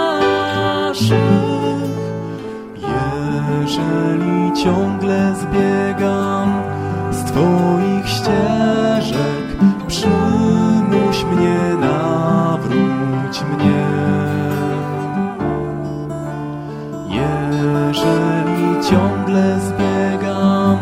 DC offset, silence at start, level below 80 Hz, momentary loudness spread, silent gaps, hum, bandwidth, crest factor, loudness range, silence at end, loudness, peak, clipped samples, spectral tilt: under 0.1%; 0 s; -40 dBFS; 8 LU; none; none; 15.5 kHz; 16 dB; 4 LU; 0 s; -17 LUFS; 0 dBFS; under 0.1%; -6.5 dB/octave